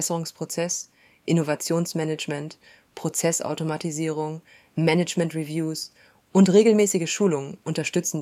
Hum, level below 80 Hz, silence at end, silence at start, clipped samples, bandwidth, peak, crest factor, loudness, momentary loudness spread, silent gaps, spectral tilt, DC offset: none; -70 dBFS; 0 s; 0 s; under 0.1%; 15.5 kHz; -4 dBFS; 20 dB; -24 LUFS; 15 LU; none; -5 dB/octave; under 0.1%